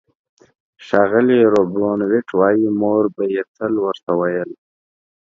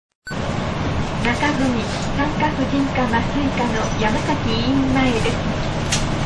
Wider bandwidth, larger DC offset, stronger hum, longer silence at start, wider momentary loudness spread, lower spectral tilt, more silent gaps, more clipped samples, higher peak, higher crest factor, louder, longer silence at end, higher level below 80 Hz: second, 7.4 kHz vs 11 kHz; second, under 0.1% vs 0.2%; neither; first, 0.8 s vs 0.25 s; first, 8 LU vs 5 LU; first, -8 dB/octave vs -5 dB/octave; first, 3.48-3.55 s, 4.03-4.07 s vs none; neither; first, 0 dBFS vs -4 dBFS; about the same, 18 dB vs 16 dB; first, -17 LUFS vs -20 LUFS; first, 0.7 s vs 0 s; second, -60 dBFS vs -30 dBFS